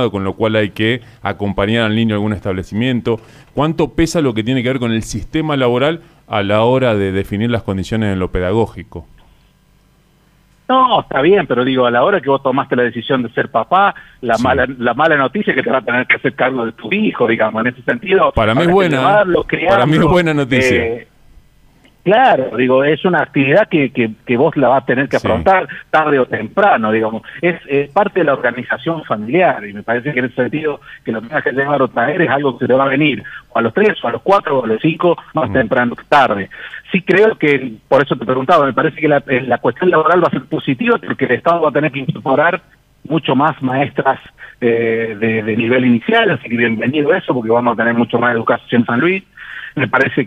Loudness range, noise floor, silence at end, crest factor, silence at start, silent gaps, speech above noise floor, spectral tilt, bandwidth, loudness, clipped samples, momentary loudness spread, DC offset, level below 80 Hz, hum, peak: 4 LU; -52 dBFS; 0 s; 12 dB; 0 s; none; 38 dB; -6.5 dB/octave; 13.5 kHz; -14 LUFS; under 0.1%; 8 LU; under 0.1%; -40 dBFS; none; -2 dBFS